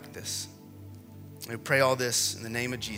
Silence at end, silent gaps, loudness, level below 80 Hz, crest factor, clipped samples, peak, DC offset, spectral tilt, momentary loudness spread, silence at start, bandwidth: 0 s; none; -28 LUFS; -64 dBFS; 20 dB; under 0.1%; -10 dBFS; under 0.1%; -2.5 dB/octave; 23 LU; 0 s; 16 kHz